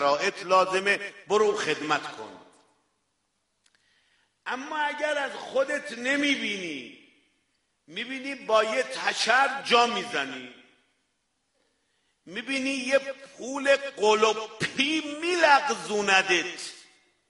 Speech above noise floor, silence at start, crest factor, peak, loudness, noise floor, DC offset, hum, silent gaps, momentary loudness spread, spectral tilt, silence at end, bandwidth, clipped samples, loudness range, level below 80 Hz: 50 dB; 0 s; 22 dB; -6 dBFS; -25 LUFS; -76 dBFS; under 0.1%; none; none; 16 LU; -2.5 dB/octave; 0.45 s; 11.5 kHz; under 0.1%; 9 LU; -74 dBFS